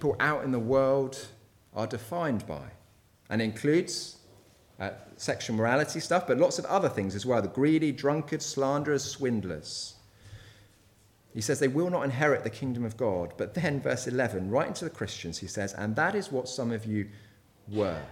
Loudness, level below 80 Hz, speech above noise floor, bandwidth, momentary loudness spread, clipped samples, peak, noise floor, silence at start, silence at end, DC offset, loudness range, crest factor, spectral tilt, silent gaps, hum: -29 LUFS; -62 dBFS; 33 dB; 16.5 kHz; 11 LU; under 0.1%; -10 dBFS; -62 dBFS; 0 s; 0 s; under 0.1%; 5 LU; 20 dB; -5 dB/octave; none; none